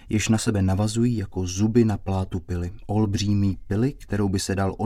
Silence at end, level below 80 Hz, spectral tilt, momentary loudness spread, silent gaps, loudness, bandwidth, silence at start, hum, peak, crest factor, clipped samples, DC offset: 0 s; -42 dBFS; -6 dB/octave; 7 LU; none; -24 LUFS; 14 kHz; 0.05 s; none; -8 dBFS; 16 dB; under 0.1%; under 0.1%